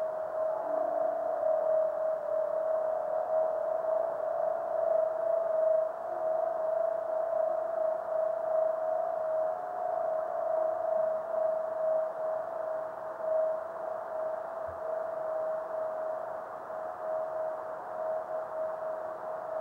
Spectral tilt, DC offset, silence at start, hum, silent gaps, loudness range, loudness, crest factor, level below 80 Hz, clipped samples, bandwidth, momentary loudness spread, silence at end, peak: -6 dB/octave; under 0.1%; 0 s; none; none; 5 LU; -32 LUFS; 12 dB; -76 dBFS; under 0.1%; 3.5 kHz; 8 LU; 0 s; -18 dBFS